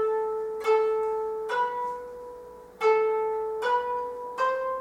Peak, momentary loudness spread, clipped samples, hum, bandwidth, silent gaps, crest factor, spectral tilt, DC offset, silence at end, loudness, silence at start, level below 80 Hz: -12 dBFS; 15 LU; under 0.1%; none; 11.5 kHz; none; 14 dB; -3 dB/octave; under 0.1%; 0 s; -27 LUFS; 0 s; -66 dBFS